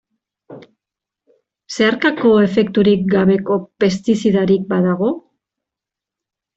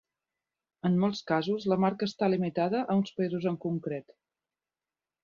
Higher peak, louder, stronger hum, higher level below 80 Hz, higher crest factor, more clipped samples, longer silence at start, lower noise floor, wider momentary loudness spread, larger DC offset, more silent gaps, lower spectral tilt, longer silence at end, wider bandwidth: first, -2 dBFS vs -12 dBFS; first, -15 LUFS vs -30 LUFS; neither; first, -54 dBFS vs -72 dBFS; about the same, 14 dB vs 18 dB; neither; second, 0.5 s vs 0.85 s; second, -86 dBFS vs under -90 dBFS; about the same, 7 LU vs 6 LU; neither; neither; about the same, -6.5 dB/octave vs -7.5 dB/octave; about the same, 1.35 s vs 1.25 s; first, 8 kHz vs 7.2 kHz